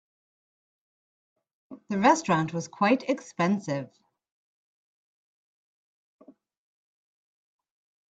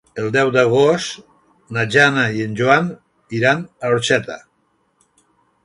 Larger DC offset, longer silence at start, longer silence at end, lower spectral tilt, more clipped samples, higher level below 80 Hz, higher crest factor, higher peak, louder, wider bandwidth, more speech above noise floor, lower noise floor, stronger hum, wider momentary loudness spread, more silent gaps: neither; first, 1.7 s vs 0.15 s; first, 4.25 s vs 1.25 s; about the same, -5.5 dB/octave vs -5 dB/octave; neither; second, -74 dBFS vs -58 dBFS; first, 24 dB vs 18 dB; second, -8 dBFS vs 0 dBFS; second, -26 LUFS vs -17 LUFS; second, 9 kHz vs 11.5 kHz; first, over 64 dB vs 47 dB; first, under -90 dBFS vs -64 dBFS; neither; second, 11 LU vs 14 LU; neither